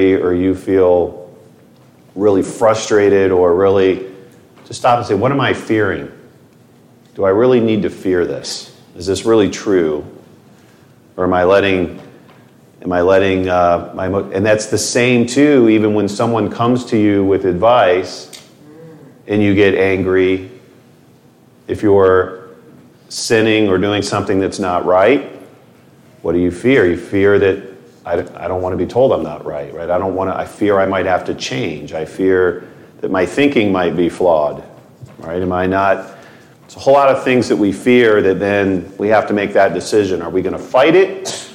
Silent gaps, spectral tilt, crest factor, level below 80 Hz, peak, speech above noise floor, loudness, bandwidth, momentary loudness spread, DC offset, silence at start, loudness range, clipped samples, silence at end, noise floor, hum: none; -5.5 dB/octave; 14 dB; -50 dBFS; 0 dBFS; 33 dB; -14 LUFS; 13.5 kHz; 13 LU; under 0.1%; 0 s; 4 LU; under 0.1%; 0 s; -47 dBFS; none